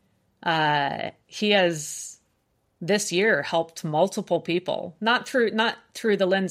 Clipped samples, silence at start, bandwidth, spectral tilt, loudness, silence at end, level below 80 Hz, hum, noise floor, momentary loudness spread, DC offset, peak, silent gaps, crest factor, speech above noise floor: under 0.1%; 0.45 s; 15.5 kHz; -4 dB/octave; -24 LUFS; 0 s; -72 dBFS; none; -70 dBFS; 11 LU; under 0.1%; -8 dBFS; none; 18 dB; 46 dB